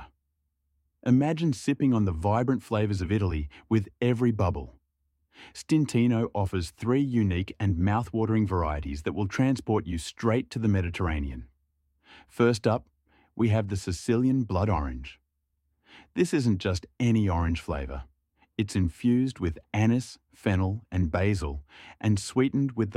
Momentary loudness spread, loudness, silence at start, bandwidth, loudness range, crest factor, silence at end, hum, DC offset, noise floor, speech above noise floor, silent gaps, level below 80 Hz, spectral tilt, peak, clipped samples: 10 LU; -27 LUFS; 0 s; 12 kHz; 2 LU; 16 dB; 0 s; none; under 0.1%; -78 dBFS; 51 dB; none; -42 dBFS; -7 dB/octave; -10 dBFS; under 0.1%